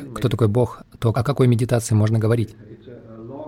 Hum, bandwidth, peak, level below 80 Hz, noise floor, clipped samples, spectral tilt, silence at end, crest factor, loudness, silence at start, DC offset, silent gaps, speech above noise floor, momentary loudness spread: none; 15 kHz; -6 dBFS; -48 dBFS; -40 dBFS; under 0.1%; -7 dB/octave; 0 s; 14 dB; -20 LUFS; 0 s; under 0.1%; none; 21 dB; 14 LU